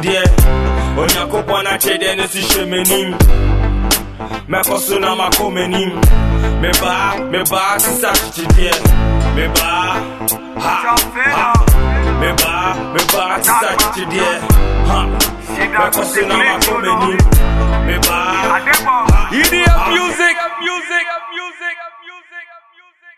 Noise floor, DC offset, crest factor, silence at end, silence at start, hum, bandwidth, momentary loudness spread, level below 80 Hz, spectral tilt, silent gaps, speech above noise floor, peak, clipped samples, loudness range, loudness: -46 dBFS; 0.4%; 12 dB; 0.1 s; 0 s; none; 14.5 kHz; 6 LU; -18 dBFS; -3.5 dB/octave; none; 34 dB; 0 dBFS; under 0.1%; 2 LU; -13 LUFS